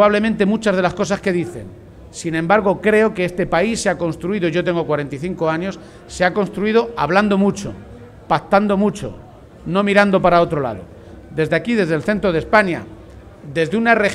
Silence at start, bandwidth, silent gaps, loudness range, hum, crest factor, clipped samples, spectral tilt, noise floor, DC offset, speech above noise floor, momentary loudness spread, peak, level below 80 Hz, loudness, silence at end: 0 s; 12.5 kHz; none; 2 LU; none; 18 dB; under 0.1%; -6 dB/octave; -39 dBFS; under 0.1%; 22 dB; 14 LU; 0 dBFS; -44 dBFS; -17 LUFS; 0 s